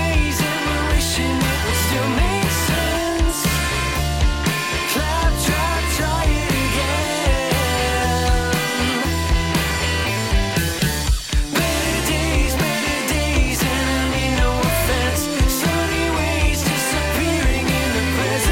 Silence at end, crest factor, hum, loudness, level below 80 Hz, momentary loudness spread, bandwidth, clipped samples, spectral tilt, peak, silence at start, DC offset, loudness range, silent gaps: 0 s; 16 dB; none; -19 LUFS; -24 dBFS; 2 LU; 17 kHz; under 0.1%; -4 dB/octave; -4 dBFS; 0 s; under 0.1%; 1 LU; none